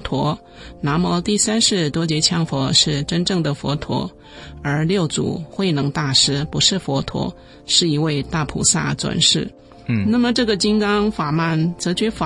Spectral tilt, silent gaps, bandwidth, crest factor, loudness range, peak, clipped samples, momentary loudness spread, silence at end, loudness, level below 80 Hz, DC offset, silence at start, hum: -4 dB/octave; none; 11.5 kHz; 18 dB; 2 LU; 0 dBFS; under 0.1%; 10 LU; 0 s; -18 LUFS; -42 dBFS; under 0.1%; 0 s; none